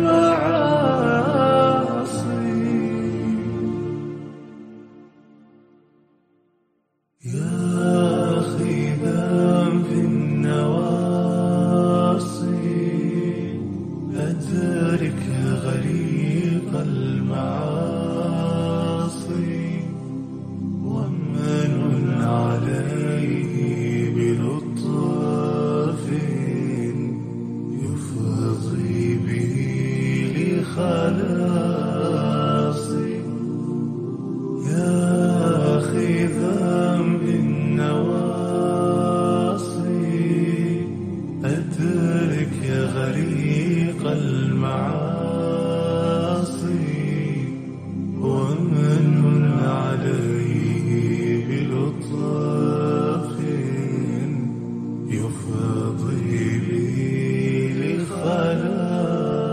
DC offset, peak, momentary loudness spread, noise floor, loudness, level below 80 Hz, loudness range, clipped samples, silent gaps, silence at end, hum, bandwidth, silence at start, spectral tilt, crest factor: under 0.1%; -6 dBFS; 8 LU; -70 dBFS; -22 LUFS; -54 dBFS; 5 LU; under 0.1%; none; 0 s; none; 9.8 kHz; 0 s; -7.5 dB/octave; 16 dB